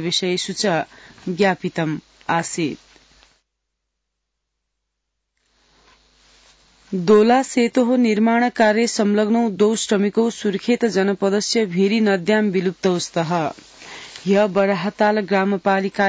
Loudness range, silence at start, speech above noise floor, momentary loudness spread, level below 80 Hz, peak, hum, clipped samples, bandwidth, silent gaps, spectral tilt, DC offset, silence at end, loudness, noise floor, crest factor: 10 LU; 0 s; 59 dB; 10 LU; -62 dBFS; -6 dBFS; none; under 0.1%; 8 kHz; none; -5 dB/octave; under 0.1%; 0 s; -19 LUFS; -78 dBFS; 14 dB